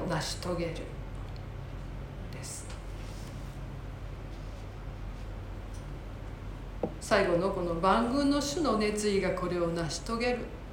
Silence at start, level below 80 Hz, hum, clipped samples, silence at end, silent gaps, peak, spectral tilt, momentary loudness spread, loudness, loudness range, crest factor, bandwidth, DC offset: 0 s; -42 dBFS; none; under 0.1%; 0 s; none; -12 dBFS; -5 dB/octave; 16 LU; -33 LUFS; 14 LU; 22 dB; 17 kHz; under 0.1%